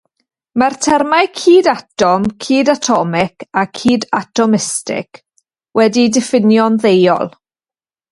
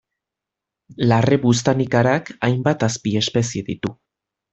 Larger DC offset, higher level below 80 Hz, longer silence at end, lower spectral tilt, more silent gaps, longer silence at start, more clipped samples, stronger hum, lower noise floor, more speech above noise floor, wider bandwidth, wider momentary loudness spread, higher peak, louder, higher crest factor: neither; about the same, -54 dBFS vs -52 dBFS; first, 0.85 s vs 0.6 s; about the same, -4.5 dB/octave vs -5.5 dB/octave; neither; second, 0.55 s vs 0.9 s; neither; neither; first, under -90 dBFS vs -85 dBFS; first, over 77 dB vs 67 dB; first, 11.5 kHz vs 8.2 kHz; about the same, 8 LU vs 9 LU; about the same, 0 dBFS vs -2 dBFS; first, -13 LUFS vs -19 LUFS; about the same, 14 dB vs 18 dB